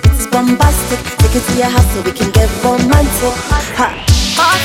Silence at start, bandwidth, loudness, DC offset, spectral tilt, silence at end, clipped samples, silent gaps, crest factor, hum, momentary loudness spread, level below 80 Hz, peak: 0 s; 17 kHz; -12 LUFS; under 0.1%; -4.5 dB/octave; 0 s; under 0.1%; none; 12 dB; none; 5 LU; -18 dBFS; 0 dBFS